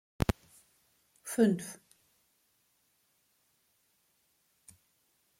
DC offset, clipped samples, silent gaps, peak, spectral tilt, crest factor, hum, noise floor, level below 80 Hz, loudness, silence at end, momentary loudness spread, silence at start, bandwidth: under 0.1%; under 0.1%; none; -12 dBFS; -6 dB/octave; 26 dB; none; -74 dBFS; -52 dBFS; -32 LUFS; 3.65 s; 20 LU; 0.2 s; 16.5 kHz